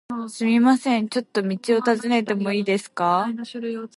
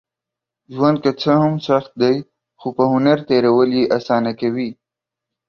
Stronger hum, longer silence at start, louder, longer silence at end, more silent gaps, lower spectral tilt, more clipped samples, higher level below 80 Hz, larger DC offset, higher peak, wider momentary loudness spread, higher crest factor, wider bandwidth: neither; second, 0.1 s vs 0.7 s; second, -22 LUFS vs -17 LUFS; second, 0.1 s vs 0.75 s; neither; second, -5.5 dB/octave vs -8 dB/octave; neither; second, -72 dBFS vs -58 dBFS; neither; second, -6 dBFS vs -2 dBFS; about the same, 11 LU vs 10 LU; about the same, 16 dB vs 16 dB; first, 11.5 kHz vs 6.8 kHz